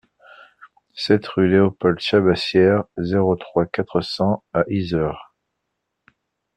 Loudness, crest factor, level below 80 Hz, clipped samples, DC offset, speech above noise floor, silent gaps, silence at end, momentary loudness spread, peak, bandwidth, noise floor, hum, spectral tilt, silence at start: -19 LUFS; 18 dB; -52 dBFS; under 0.1%; under 0.1%; 59 dB; none; 1.35 s; 7 LU; -2 dBFS; 9.4 kHz; -77 dBFS; none; -7.5 dB/octave; 0.95 s